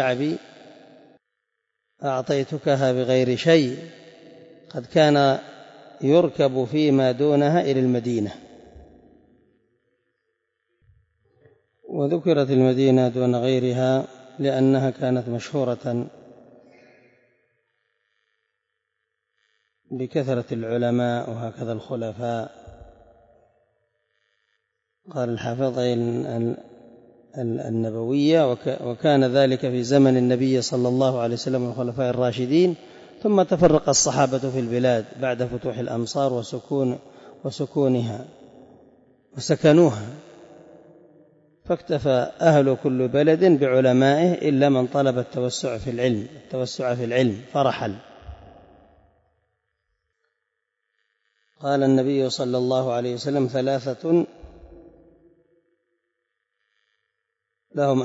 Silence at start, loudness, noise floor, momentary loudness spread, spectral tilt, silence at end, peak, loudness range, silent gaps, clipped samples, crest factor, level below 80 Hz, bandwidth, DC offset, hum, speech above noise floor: 0 s; -22 LUFS; -80 dBFS; 13 LU; -6 dB/octave; 0 s; -6 dBFS; 11 LU; none; under 0.1%; 18 dB; -58 dBFS; 8 kHz; under 0.1%; none; 59 dB